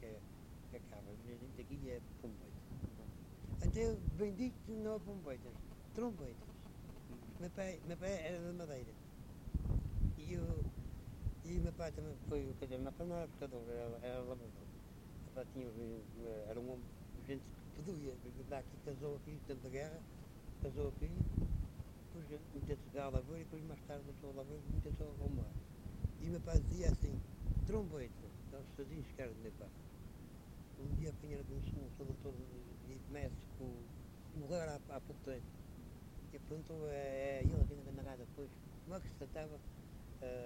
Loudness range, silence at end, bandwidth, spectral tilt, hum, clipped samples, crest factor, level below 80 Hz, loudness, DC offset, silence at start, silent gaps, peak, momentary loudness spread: 7 LU; 0 s; 16 kHz; -7.5 dB/octave; none; under 0.1%; 26 dB; -48 dBFS; -47 LUFS; under 0.1%; 0 s; none; -20 dBFS; 14 LU